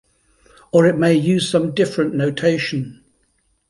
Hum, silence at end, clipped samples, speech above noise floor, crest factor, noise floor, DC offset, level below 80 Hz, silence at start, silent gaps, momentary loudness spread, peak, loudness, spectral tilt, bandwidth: none; 0.75 s; under 0.1%; 48 dB; 16 dB; -64 dBFS; under 0.1%; -56 dBFS; 0.75 s; none; 8 LU; -2 dBFS; -18 LUFS; -6 dB/octave; 11.5 kHz